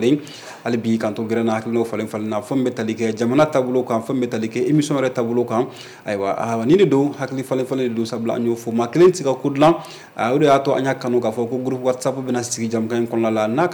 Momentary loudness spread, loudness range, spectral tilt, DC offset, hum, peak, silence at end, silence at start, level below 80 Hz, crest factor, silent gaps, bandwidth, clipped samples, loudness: 9 LU; 3 LU; -6 dB/octave; under 0.1%; none; -6 dBFS; 0 s; 0 s; -62 dBFS; 14 dB; none; 19 kHz; under 0.1%; -20 LUFS